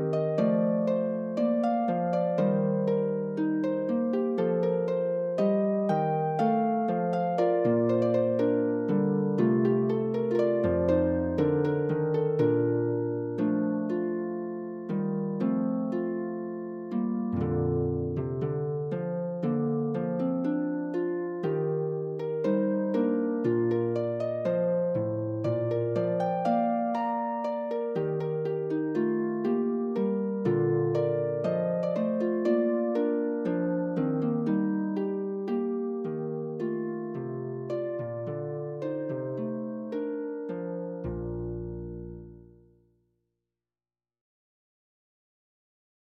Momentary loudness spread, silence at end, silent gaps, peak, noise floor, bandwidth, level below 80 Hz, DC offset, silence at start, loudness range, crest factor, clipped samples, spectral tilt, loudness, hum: 8 LU; 3.65 s; none; -12 dBFS; under -90 dBFS; 7 kHz; -60 dBFS; under 0.1%; 0 s; 8 LU; 16 dB; under 0.1%; -10 dB/octave; -28 LUFS; none